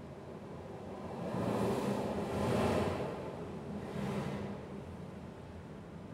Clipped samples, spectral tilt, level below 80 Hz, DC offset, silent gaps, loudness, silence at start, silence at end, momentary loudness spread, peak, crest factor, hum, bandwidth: under 0.1%; -7 dB/octave; -60 dBFS; under 0.1%; none; -38 LUFS; 0 s; 0 s; 15 LU; -20 dBFS; 18 dB; none; 16 kHz